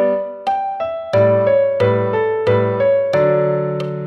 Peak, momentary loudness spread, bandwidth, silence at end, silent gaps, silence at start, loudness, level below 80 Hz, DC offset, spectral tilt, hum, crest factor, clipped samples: -4 dBFS; 7 LU; 6.2 kHz; 0 s; none; 0 s; -16 LUFS; -54 dBFS; under 0.1%; -8.5 dB/octave; none; 12 dB; under 0.1%